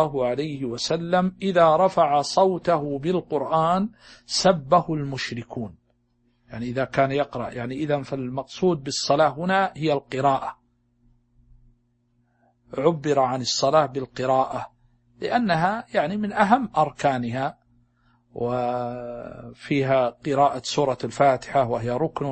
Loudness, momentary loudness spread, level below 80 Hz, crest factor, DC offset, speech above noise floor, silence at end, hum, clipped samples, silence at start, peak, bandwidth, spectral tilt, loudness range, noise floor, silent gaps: -23 LUFS; 12 LU; -56 dBFS; 22 dB; under 0.1%; 44 dB; 0 s; none; under 0.1%; 0 s; -2 dBFS; 8.8 kHz; -5 dB/octave; 6 LU; -66 dBFS; none